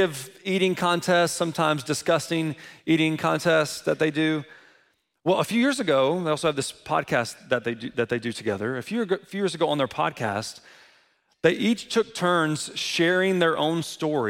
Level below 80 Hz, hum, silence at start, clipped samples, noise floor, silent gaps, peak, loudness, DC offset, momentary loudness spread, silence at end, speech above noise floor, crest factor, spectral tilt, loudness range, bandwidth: -66 dBFS; none; 0 s; under 0.1%; -65 dBFS; none; -8 dBFS; -24 LUFS; under 0.1%; 7 LU; 0 s; 40 dB; 18 dB; -4.5 dB/octave; 4 LU; 16.5 kHz